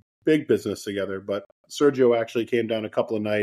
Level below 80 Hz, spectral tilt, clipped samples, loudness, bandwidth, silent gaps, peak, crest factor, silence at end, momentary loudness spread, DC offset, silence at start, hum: -68 dBFS; -5.5 dB/octave; under 0.1%; -24 LUFS; 13.5 kHz; 1.46-1.64 s; -8 dBFS; 16 dB; 0 s; 10 LU; under 0.1%; 0.25 s; none